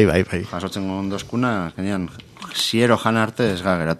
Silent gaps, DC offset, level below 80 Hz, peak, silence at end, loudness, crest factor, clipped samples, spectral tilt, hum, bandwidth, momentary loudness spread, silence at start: none; under 0.1%; -46 dBFS; 0 dBFS; 0 s; -21 LUFS; 20 dB; under 0.1%; -5.5 dB/octave; none; 14 kHz; 10 LU; 0 s